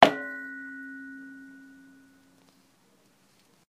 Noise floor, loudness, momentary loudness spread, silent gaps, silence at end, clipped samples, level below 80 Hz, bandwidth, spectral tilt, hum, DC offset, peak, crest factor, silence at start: -64 dBFS; -31 LUFS; 19 LU; none; 2.25 s; under 0.1%; -72 dBFS; 15.5 kHz; -4 dB/octave; none; under 0.1%; 0 dBFS; 30 dB; 0 s